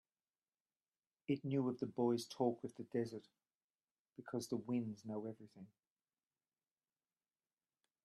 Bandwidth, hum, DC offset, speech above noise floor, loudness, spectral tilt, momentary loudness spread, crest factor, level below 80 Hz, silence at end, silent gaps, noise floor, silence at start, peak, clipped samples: 12.5 kHz; none; under 0.1%; over 48 dB; -42 LUFS; -6.5 dB/octave; 19 LU; 22 dB; -88 dBFS; 2.4 s; 3.55-3.69 s, 3.91-4.05 s; under -90 dBFS; 1.3 s; -24 dBFS; under 0.1%